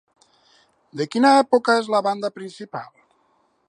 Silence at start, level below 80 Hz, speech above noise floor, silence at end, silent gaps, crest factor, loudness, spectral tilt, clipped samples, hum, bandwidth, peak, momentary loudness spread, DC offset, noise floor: 0.95 s; -78 dBFS; 45 dB; 0.85 s; none; 18 dB; -19 LUFS; -4.5 dB/octave; under 0.1%; none; 11.5 kHz; -4 dBFS; 19 LU; under 0.1%; -64 dBFS